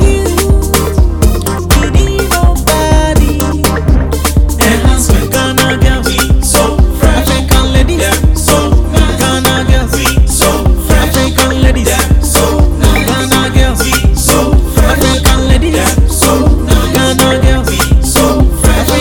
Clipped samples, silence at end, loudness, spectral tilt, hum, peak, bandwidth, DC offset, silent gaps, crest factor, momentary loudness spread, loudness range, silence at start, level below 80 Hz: 0.5%; 0 s; -9 LUFS; -4.5 dB/octave; none; 0 dBFS; 19.5 kHz; under 0.1%; none; 8 dB; 3 LU; 1 LU; 0 s; -12 dBFS